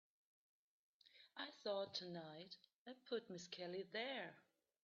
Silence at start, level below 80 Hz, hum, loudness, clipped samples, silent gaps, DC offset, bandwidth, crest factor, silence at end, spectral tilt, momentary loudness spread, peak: 1.05 s; under -90 dBFS; none; -50 LUFS; under 0.1%; 2.75-2.86 s; under 0.1%; 7.2 kHz; 20 dB; 0.45 s; -2 dB/octave; 14 LU; -32 dBFS